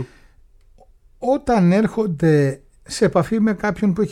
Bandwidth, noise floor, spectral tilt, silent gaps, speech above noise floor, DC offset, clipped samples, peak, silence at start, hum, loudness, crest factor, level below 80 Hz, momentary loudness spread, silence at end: 12.5 kHz; -50 dBFS; -7 dB/octave; none; 33 dB; under 0.1%; under 0.1%; -4 dBFS; 0 s; none; -18 LUFS; 16 dB; -46 dBFS; 11 LU; 0 s